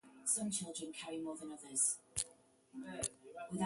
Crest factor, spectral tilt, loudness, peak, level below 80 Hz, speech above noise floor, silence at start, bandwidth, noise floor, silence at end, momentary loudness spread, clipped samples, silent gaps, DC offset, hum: 26 dB; -2.5 dB/octave; -40 LUFS; -16 dBFS; -70 dBFS; 23 dB; 0.05 s; 12 kHz; -65 dBFS; 0 s; 15 LU; under 0.1%; none; under 0.1%; none